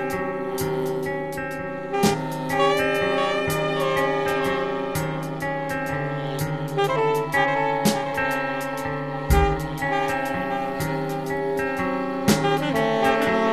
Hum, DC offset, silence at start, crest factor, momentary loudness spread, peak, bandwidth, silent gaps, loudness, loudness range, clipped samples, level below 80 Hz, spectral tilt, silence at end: none; under 0.1%; 0 s; 18 dB; 7 LU; -4 dBFS; 14 kHz; none; -24 LUFS; 2 LU; under 0.1%; -38 dBFS; -5 dB/octave; 0 s